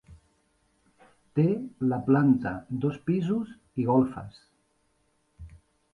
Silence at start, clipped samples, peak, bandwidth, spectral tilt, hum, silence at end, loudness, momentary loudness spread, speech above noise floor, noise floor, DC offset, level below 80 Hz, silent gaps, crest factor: 0.1 s; under 0.1%; -10 dBFS; 7 kHz; -10 dB/octave; none; 0.45 s; -27 LUFS; 10 LU; 45 dB; -71 dBFS; under 0.1%; -58 dBFS; none; 18 dB